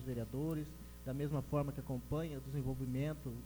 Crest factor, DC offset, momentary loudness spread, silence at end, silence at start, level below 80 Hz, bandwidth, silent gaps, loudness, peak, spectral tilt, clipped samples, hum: 16 dB; under 0.1%; 6 LU; 0 s; 0 s; -54 dBFS; over 20 kHz; none; -41 LUFS; -24 dBFS; -8 dB/octave; under 0.1%; none